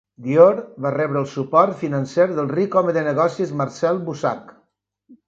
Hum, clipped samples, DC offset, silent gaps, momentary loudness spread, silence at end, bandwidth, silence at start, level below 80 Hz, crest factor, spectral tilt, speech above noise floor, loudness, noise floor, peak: none; under 0.1%; under 0.1%; none; 10 LU; 0.15 s; 7.8 kHz; 0.2 s; -66 dBFS; 20 dB; -7.5 dB/octave; 48 dB; -19 LUFS; -67 dBFS; 0 dBFS